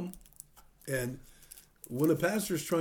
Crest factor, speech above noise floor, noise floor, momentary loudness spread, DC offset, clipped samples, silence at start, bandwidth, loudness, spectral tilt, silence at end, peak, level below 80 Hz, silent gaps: 18 dB; 25 dB; -56 dBFS; 23 LU; under 0.1%; under 0.1%; 0 s; over 20 kHz; -32 LUFS; -5 dB/octave; 0 s; -16 dBFS; -60 dBFS; none